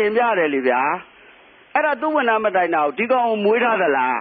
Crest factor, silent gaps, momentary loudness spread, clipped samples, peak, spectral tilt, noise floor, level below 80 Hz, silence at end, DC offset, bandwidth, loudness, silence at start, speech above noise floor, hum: 14 dB; none; 3 LU; under 0.1%; -6 dBFS; -9.5 dB/octave; -48 dBFS; -68 dBFS; 0 s; under 0.1%; 4.7 kHz; -19 LUFS; 0 s; 30 dB; none